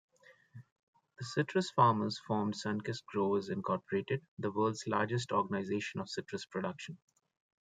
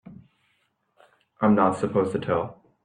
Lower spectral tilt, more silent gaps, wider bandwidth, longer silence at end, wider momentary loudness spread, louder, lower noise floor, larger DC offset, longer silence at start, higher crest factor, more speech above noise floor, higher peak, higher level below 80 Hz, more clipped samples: second, -6 dB/octave vs -8 dB/octave; first, 0.72-0.93 s, 4.28-4.37 s vs none; about the same, 9.4 kHz vs 9.8 kHz; first, 0.65 s vs 0.3 s; first, 12 LU vs 7 LU; second, -35 LUFS vs -24 LUFS; second, -58 dBFS vs -71 dBFS; neither; first, 0.3 s vs 0.05 s; about the same, 22 dB vs 20 dB; second, 23 dB vs 48 dB; second, -14 dBFS vs -6 dBFS; second, -78 dBFS vs -62 dBFS; neither